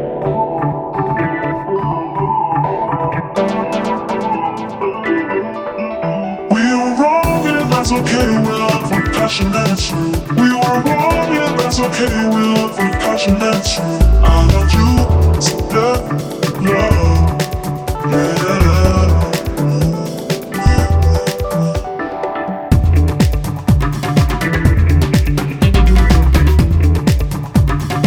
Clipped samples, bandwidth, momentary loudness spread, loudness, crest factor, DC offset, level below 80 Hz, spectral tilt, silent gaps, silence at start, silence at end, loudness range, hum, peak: under 0.1%; 17 kHz; 8 LU; -15 LUFS; 14 dB; under 0.1%; -18 dBFS; -6 dB/octave; none; 0 s; 0 s; 5 LU; none; 0 dBFS